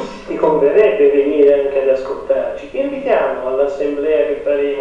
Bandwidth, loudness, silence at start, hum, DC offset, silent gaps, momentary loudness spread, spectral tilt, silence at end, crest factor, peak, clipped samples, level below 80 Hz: 7.2 kHz; -15 LUFS; 0 s; none; under 0.1%; none; 8 LU; -6.5 dB/octave; 0 s; 14 dB; -2 dBFS; under 0.1%; -46 dBFS